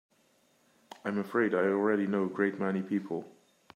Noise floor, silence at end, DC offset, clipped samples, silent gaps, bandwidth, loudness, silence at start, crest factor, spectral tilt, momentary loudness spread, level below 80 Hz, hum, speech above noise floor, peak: -68 dBFS; 0.45 s; under 0.1%; under 0.1%; none; 13.5 kHz; -31 LUFS; 1.05 s; 16 dB; -8 dB/octave; 10 LU; -82 dBFS; none; 39 dB; -16 dBFS